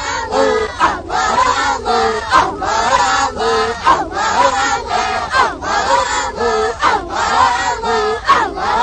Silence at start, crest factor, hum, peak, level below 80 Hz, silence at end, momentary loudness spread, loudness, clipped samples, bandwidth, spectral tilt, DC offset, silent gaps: 0 s; 14 dB; none; 0 dBFS; -36 dBFS; 0 s; 4 LU; -14 LUFS; under 0.1%; 9.6 kHz; -2.5 dB/octave; under 0.1%; none